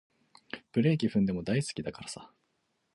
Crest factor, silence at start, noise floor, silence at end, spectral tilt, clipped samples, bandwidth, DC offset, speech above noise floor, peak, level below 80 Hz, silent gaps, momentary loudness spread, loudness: 18 dB; 0.55 s; -77 dBFS; 0.7 s; -6.5 dB/octave; under 0.1%; 11.5 kHz; under 0.1%; 47 dB; -14 dBFS; -62 dBFS; none; 18 LU; -30 LUFS